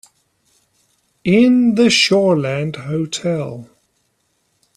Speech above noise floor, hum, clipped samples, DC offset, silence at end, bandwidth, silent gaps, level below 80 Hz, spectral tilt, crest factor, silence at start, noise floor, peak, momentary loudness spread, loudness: 51 dB; none; under 0.1%; under 0.1%; 1.1 s; 12 kHz; none; -58 dBFS; -5 dB/octave; 16 dB; 1.25 s; -65 dBFS; 0 dBFS; 13 LU; -15 LUFS